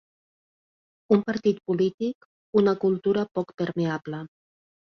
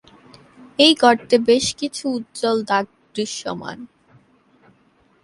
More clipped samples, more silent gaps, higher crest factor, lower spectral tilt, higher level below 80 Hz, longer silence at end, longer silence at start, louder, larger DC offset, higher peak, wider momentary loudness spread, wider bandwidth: neither; first, 1.94-1.98 s, 2.15-2.53 s vs none; about the same, 20 dB vs 20 dB; first, -8 dB/octave vs -3 dB/octave; second, -66 dBFS vs -60 dBFS; second, 0.7 s vs 1.4 s; first, 1.1 s vs 0.8 s; second, -25 LUFS vs -18 LUFS; neither; second, -8 dBFS vs 0 dBFS; second, 13 LU vs 17 LU; second, 6.4 kHz vs 11.5 kHz